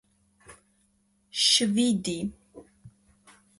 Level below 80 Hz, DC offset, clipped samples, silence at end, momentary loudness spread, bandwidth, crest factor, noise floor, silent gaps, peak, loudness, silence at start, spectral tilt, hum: -62 dBFS; under 0.1%; under 0.1%; 0.7 s; 15 LU; 11.5 kHz; 22 dB; -69 dBFS; none; -8 dBFS; -24 LUFS; 0.5 s; -2.5 dB/octave; none